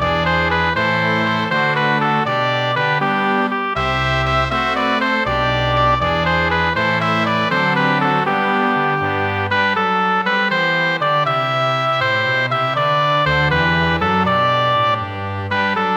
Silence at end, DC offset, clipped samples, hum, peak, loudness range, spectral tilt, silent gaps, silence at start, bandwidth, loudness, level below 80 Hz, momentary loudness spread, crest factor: 0 s; under 0.1%; under 0.1%; none; -4 dBFS; 1 LU; -6 dB/octave; none; 0 s; 19.5 kHz; -16 LUFS; -38 dBFS; 3 LU; 14 dB